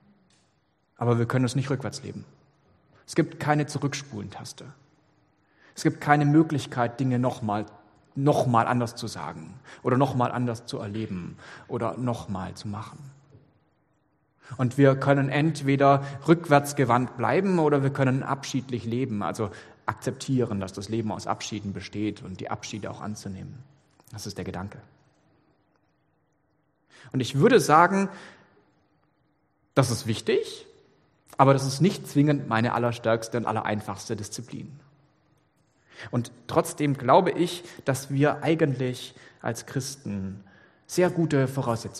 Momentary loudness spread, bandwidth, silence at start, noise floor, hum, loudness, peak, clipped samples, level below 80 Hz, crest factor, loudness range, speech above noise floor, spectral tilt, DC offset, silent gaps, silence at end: 17 LU; 13 kHz; 1 s; -70 dBFS; none; -26 LUFS; -2 dBFS; under 0.1%; -64 dBFS; 24 dB; 11 LU; 45 dB; -6 dB/octave; under 0.1%; none; 0 s